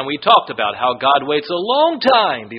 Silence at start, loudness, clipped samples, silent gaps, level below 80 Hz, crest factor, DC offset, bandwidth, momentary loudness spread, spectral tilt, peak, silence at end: 0 s; -15 LUFS; under 0.1%; none; -60 dBFS; 16 dB; under 0.1%; 5.8 kHz; 6 LU; -0.5 dB/octave; 0 dBFS; 0 s